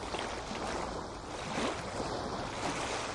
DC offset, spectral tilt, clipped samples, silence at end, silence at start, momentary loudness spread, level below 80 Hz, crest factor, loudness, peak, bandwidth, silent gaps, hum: under 0.1%; -3.5 dB/octave; under 0.1%; 0 s; 0 s; 5 LU; -52 dBFS; 16 dB; -37 LUFS; -22 dBFS; 11.5 kHz; none; none